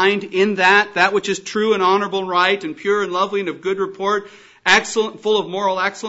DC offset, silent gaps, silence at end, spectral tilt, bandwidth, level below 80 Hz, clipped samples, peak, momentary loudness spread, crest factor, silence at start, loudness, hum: under 0.1%; none; 0 s; -3.5 dB/octave; 8 kHz; -62 dBFS; under 0.1%; 0 dBFS; 9 LU; 18 dB; 0 s; -18 LUFS; none